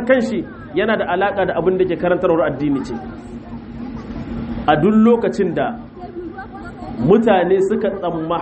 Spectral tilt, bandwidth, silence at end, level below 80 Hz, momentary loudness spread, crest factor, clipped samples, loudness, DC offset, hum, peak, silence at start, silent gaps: -7.5 dB/octave; 8.4 kHz; 0 s; -42 dBFS; 19 LU; 18 dB; under 0.1%; -17 LUFS; under 0.1%; none; 0 dBFS; 0 s; none